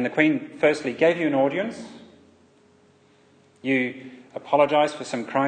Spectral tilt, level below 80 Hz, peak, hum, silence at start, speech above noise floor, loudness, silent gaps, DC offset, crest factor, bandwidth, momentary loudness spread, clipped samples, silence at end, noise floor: -5.5 dB/octave; -72 dBFS; -4 dBFS; none; 0 s; 35 dB; -23 LUFS; none; under 0.1%; 20 dB; 9.4 kHz; 19 LU; under 0.1%; 0 s; -57 dBFS